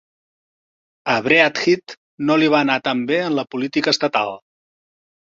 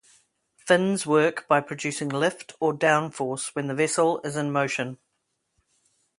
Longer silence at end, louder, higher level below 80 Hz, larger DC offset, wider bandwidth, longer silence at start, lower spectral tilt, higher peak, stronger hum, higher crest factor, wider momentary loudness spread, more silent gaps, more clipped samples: second, 0.95 s vs 1.25 s; first, -18 LUFS vs -25 LUFS; first, -64 dBFS vs -72 dBFS; neither; second, 7.6 kHz vs 11.5 kHz; first, 1.05 s vs 0.65 s; about the same, -4.5 dB/octave vs -4.5 dB/octave; first, 0 dBFS vs -4 dBFS; neither; about the same, 20 dB vs 22 dB; about the same, 10 LU vs 8 LU; first, 1.97-2.18 s vs none; neither